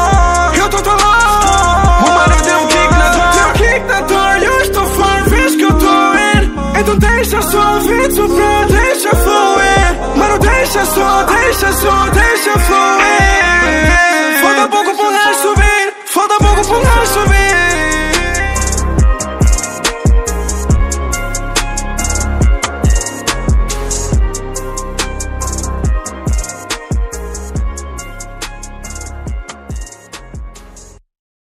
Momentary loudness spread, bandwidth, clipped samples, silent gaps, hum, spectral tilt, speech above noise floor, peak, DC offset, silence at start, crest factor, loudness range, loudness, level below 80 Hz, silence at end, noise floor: 13 LU; 16.5 kHz; under 0.1%; none; none; -4 dB/octave; 27 dB; 0 dBFS; under 0.1%; 0 s; 12 dB; 11 LU; -11 LUFS; -18 dBFS; 0.7 s; -36 dBFS